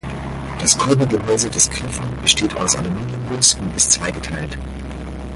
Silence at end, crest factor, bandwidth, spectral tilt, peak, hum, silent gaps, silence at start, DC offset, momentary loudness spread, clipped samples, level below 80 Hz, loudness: 0 s; 20 dB; 11.5 kHz; -2.5 dB/octave; 0 dBFS; none; none; 0.05 s; under 0.1%; 14 LU; under 0.1%; -34 dBFS; -17 LUFS